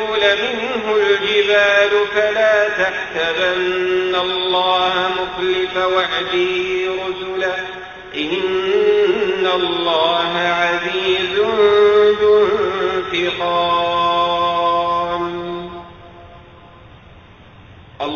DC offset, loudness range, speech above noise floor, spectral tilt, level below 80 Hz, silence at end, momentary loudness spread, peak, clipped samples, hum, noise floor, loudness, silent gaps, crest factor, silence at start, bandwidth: under 0.1%; 5 LU; 25 dB; -4 dB/octave; -50 dBFS; 0 s; 9 LU; 0 dBFS; under 0.1%; none; -42 dBFS; -16 LUFS; none; 16 dB; 0 s; 7 kHz